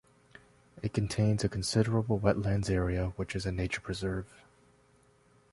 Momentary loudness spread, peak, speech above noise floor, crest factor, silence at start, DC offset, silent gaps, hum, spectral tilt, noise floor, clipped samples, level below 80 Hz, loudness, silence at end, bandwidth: 7 LU; -10 dBFS; 34 dB; 22 dB; 0.75 s; under 0.1%; none; none; -6 dB/octave; -65 dBFS; under 0.1%; -46 dBFS; -32 LUFS; 1.25 s; 11.5 kHz